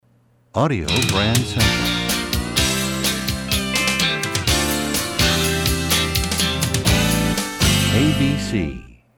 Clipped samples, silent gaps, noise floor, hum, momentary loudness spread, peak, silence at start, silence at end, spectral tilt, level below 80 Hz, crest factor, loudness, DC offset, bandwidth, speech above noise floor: under 0.1%; none; -57 dBFS; none; 5 LU; -4 dBFS; 0.55 s; 0.25 s; -3.5 dB/octave; -32 dBFS; 16 dB; -18 LUFS; under 0.1%; 19.5 kHz; 39 dB